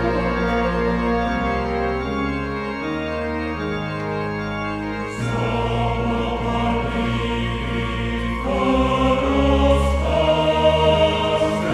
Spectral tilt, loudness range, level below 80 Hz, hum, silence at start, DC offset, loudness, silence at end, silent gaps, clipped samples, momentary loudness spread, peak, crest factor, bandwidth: -6.5 dB/octave; 7 LU; -28 dBFS; none; 0 s; under 0.1%; -21 LUFS; 0 s; none; under 0.1%; 8 LU; -4 dBFS; 16 dB; 12 kHz